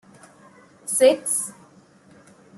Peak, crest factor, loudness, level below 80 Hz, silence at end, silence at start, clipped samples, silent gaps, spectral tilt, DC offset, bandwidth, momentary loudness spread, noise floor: -4 dBFS; 20 dB; -20 LUFS; -72 dBFS; 1.05 s; 0.85 s; under 0.1%; none; -1.5 dB/octave; under 0.1%; 12.5 kHz; 16 LU; -52 dBFS